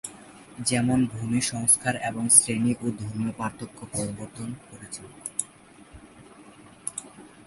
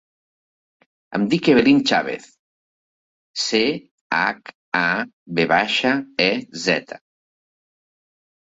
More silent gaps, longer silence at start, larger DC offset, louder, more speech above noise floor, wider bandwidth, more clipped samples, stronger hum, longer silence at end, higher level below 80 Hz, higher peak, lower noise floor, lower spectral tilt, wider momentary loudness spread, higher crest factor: second, none vs 2.39-3.34 s, 3.91-4.10 s, 4.55-4.72 s, 5.13-5.26 s; second, 0.05 s vs 1.1 s; neither; second, -24 LUFS vs -19 LUFS; second, 25 dB vs over 71 dB; first, 12 kHz vs 8 kHz; neither; neither; second, 0.05 s vs 1.5 s; about the same, -58 dBFS vs -62 dBFS; about the same, 0 dBFS vs -2 dBFS; second, -51 dBFS vs under -90 dBFS; about the same, -3.5 dB/octave vs -4.5 dB/octave; first, 22 LU vs 16 LU; first, 28 dB vs 20 dB